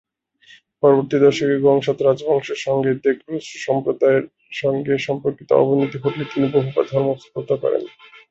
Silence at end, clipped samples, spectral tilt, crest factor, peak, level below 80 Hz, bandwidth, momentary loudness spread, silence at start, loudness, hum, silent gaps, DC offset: 0.4 s; under 0.1%; -6.5 dB/octave; 16 dB; -2 dBFS; -62 dBFS; 7.8 kHz; 8 LU; 0.85 s; -19 LUFS; none; none; under 0.1%